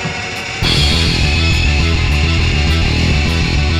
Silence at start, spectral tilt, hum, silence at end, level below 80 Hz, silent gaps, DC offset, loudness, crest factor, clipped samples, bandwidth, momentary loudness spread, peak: 0 s; -4.5 dB/octave; none; 0 s; -18 dBFS; none; under 0.1%; -14 LUFS; 12 dB; under 0.1%; 13 kHz; 4 LU; -2 dBFS